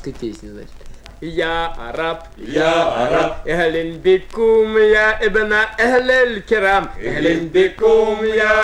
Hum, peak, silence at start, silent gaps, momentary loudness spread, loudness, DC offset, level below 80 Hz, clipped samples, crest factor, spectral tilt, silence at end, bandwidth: none; -2 dBFS; 0 s; none; 12 LU; -16 LUFS; under 0.1%; -36 dBFS; under 0.1%; 14 dB; -5 dB/octave; 0 s; 11 kHz